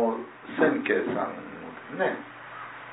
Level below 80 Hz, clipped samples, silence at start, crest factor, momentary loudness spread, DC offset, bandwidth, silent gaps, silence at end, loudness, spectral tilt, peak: -74 dBFS; under 0.1%; 0 s; 20 dB; 16 LU; under 0.1%; 4 kHz; none; 0 s; -28 LUFS; -9.5 dB/octave; -8 dBFS